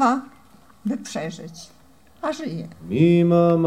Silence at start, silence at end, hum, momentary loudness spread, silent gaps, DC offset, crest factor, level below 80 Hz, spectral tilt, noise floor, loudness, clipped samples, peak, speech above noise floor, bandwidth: 0 s; 0 s; none; 19 LU; none; 0.2%; 16 dB; -56 dBFS; -7.5 dB/octave; -52 dBFS; -22 LUFS; under 0.1%; -6 dBFS; 32 dB; 10.5 kHz